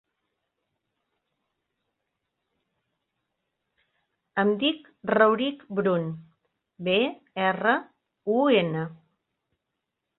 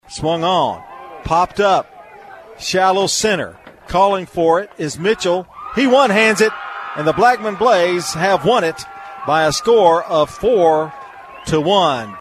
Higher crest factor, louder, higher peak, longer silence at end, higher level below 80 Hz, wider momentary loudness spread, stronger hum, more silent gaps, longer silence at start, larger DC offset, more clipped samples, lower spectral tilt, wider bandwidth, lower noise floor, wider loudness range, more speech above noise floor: first, 24 dB vs 16 dB; second, -25 LUFS vs -15 LUFS; second, -6 dBFS vs 0 dBFS; first, 1.25 s vs 0 s; second, -72 dBFS vs -46 dBFS; about the same, 13 LU vs 15 LU; neither; neither; first, 4.35 s vs 0.1 s; neither; neither; first, -9.5 dB/octave vs -4 dB/octave; second, 4.2 kHz vs 13.5 kHz; first, -83 dBFS vs -38 dBFS; first, 6 LU vs 3 LU; first, 59 dB vs 23 dB